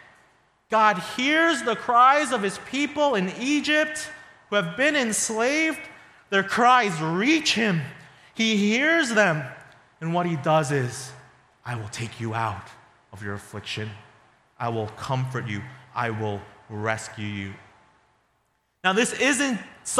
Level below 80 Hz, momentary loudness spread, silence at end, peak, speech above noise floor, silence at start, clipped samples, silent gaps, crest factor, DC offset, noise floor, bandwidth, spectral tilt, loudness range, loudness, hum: -66 dBFS; 16 LU; 0 s; -4 dBFS; 47 dB; 0.7 s; under 0.1%; none; 20 dB; under 0.1%; -70 dBFS; 14.5 kHz; -4 dB/octave; 11 LU; -23 LUFS; none